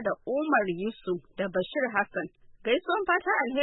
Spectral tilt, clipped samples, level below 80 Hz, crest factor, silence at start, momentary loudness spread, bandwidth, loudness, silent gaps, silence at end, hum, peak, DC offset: -9 dB/octave; under 0.1%; -62 dBFS; 18 dB; 0 s; 9 LU; 4.1 kHz; -29 LUFS; none; 0 s; none; -10 dBFS; under 0.1%